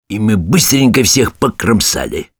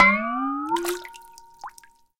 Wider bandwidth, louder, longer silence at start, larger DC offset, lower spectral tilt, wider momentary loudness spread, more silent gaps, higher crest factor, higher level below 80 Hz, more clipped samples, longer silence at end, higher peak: first, over 20 kHz vs 17 kHz; first, -11 LUFS vs -24 LUFS; about the same, 0.1 s vs 0 s; neither; about the same, -4 dB/octave vs -4 dB/octave; second, 6 LU vs 20 LU; neither; second, 12 dB vs 24 dB; first, -34 dBFS vs -56 dBFS; neither; second, 0.15 s vs 0.5 s; about the same, 0 dBFS vs 0 dBFS